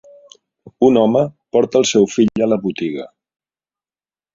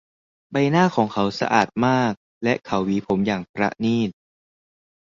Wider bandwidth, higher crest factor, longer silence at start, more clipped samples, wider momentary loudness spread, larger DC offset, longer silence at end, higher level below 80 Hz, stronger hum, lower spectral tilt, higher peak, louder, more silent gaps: about the same, 7.6 kHz vs 7.6 kHz; about the same, 16 dB vs 20 dB; first, 0.65 s vs 0.5 s; neither; first, 10 LU vs 7 LU; neither; first, 1.3 s vs 0.9 s; about the same, -56 dBFS vs -56 dBFS; neither; second, -5 dB/octave vs -6.5 dB/octave; about the same, -2 dBFS vs -2 dBFS; first, -16 LUFS vs -22 LUFS; second, none vs 2.17-2.41 s, 3.49-3.54 s